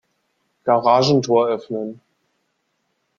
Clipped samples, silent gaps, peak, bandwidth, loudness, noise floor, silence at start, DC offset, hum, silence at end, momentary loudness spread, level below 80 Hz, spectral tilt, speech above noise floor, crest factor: under 0.1%; none; -2 dBFS; 7.4 kHz; -18 LUFS; -71 dBFS; 0.65 s; under 0.1%; none; 1.25 s; 13 LU; -62 dBFS; -6 dB/octave; 54 dB; 20 dB